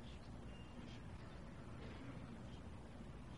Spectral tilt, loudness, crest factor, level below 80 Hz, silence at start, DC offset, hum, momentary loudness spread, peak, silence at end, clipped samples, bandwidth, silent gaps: -6.5 dB/octave; -55 LUFS; 12 dB; -60 dBFS; 0 s; under 0.1%; none; 2 LU; -40 dBFS; 0 s; under 0.1%; 11.5 kHz; none